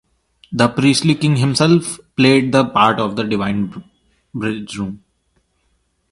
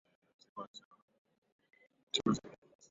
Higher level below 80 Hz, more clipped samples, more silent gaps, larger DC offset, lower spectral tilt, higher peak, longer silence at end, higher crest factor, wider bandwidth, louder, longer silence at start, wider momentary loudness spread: first, -50 dBFS vs -74 dBFS; neither; second, none vs 0.67-0.74 s, 0.85-0.91 s, 1.02-1.08 s, 1.18-1.25 s, 1.38-1.42 s, 1.52-1.59 s, 2.03-2.07 s; neither; first, -5.5 dB/octave vs -4 dB/octave; first, 0 dBFS vs -16 dBFS; first, 1.15 s vs 0.35 s; second, 18 dB vs 28 dB; first, 11.5 kHz vs 7.6 kHz; first, -16 LUFS vs -38 LUFS; about the same, 0.5 s vs 0.55 s; second, 13 LU vs 22 LU